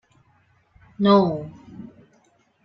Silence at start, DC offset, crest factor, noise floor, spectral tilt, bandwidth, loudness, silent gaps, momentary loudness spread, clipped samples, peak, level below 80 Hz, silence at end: 1 s; under 0.1%; 22 dB; -62 dBFS; -9 dB/octave; 6 kHz; -20 LUFS; none; 25 LU; under 0.1%; -2 dBFS; -60 dBFS; 0.8 s